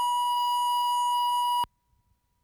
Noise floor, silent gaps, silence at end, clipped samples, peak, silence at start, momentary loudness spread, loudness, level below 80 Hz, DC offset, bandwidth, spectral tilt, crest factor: -70 dBFS; none; 0.8 s; under 0.1%; -20 dBFS; 0 s; 3 LU; -26 LUFS; -70 dBFS; under 0.1%; over 20 kHz; 1.5 dB/octave; 8 dB